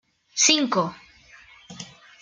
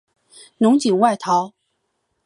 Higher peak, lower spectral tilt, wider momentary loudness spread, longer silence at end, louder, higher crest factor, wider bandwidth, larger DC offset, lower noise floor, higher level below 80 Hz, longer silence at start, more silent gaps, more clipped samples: about the same, -4 dBFS vs -2 dBFS; second, -1.5 dB/octave vs -5.5 dB/octave; first, 23 LU vs 5 LU; second, 0.35 s vs 0.8 s; second, -21 LUFS vs -18 LUFS; about the same, 22 dB vs 18 dB; about the same, 11 kHz vs 11.5 kHz; neither; second, -51 dBFS vs -72 dBFS; first, -68 dBFS vs -74 dBFS; second, 0.35 s vs 0.6 s; neither; neither